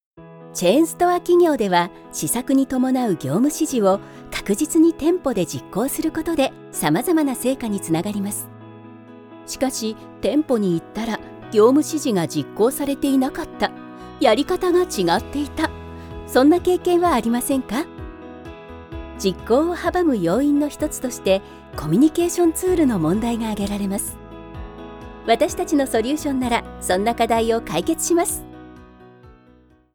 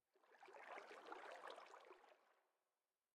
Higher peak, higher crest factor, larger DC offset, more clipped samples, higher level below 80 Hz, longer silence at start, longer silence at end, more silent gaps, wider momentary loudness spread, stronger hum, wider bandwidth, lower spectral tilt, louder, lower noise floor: first, -4 dBFS vs -40 dBFS; second, 16 dB vs 22 dB; neither; neither; first, -44 dBFS vs under -90 dBFS; about the same, 0.2 s vs 0.15 s; about the same, 0.7 s vs 0.7 s; neither; first, 18 LU vs 10 LU; neither; first, over 20 kHz vs 11.5 kHz; first, -5 dB/octave vs -1.5 dB/octave; first, -20 LUFS vs -60 LUFS; second, -52 dBFS vs under -90 dBFS